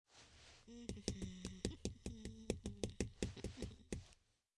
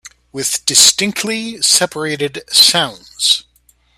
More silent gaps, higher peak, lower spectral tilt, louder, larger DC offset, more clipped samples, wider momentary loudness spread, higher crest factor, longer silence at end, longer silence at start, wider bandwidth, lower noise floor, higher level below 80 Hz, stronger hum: neither; second, -22 dBFS vs 0 dBFS; first, -5 dB/octave vs -0.5 dB/octave; second, -49 LUFS vs -12 LUFS; neither; second, under 0.1% vs 0.1%; first, 16 LU vs 13 LU; first, 28 dB vs 16 dB; second, 0.45 s vs 0.6 s; about the same, 0.1 s vs 0.05 s; second, 12 kHz vs over 20 kHz; first, -72 dBFS vs -54 dBFS; about the same, -58 dBFS vs -56 dBFS; neither